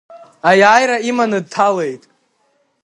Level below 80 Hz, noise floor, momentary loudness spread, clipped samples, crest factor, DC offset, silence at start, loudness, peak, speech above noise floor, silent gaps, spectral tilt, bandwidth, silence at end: -64 dBFS; -62 dBFS; 12 LU; under 0.1%; 16 dB; under 0.1%; 0.1 s; -14 LUFS; 0 dBFS; 49 dB; none; -4 dB/octave; 11.5 kHz; 0.85 s